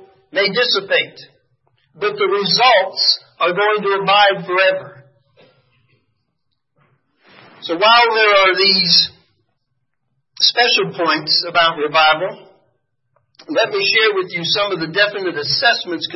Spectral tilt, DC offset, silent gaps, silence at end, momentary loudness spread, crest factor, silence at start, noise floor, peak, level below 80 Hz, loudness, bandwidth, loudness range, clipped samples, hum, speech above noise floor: -3.5 dB/octave; under 0.1%; none; 0 s; 9 LU; 18 dB; 0.35 s; -73 dBFS; 0 dBFS; -64 dBFS; -14 LUFS; 6 kHz; 5 LU; under 0.1%; none; 57 dB